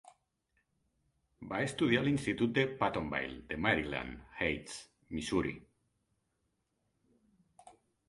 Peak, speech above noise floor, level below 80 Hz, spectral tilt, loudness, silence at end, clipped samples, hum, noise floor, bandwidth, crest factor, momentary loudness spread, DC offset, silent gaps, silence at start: -12 dBFS; 47 dB; -58 dBFS; -5.5 dB/octave; -34 LUFS; 0.35 s; under 0.1%; none; -81 dBFS; 11.5 kHz; 24 dB; 14 LU; under 0.1%; none; 1.4 s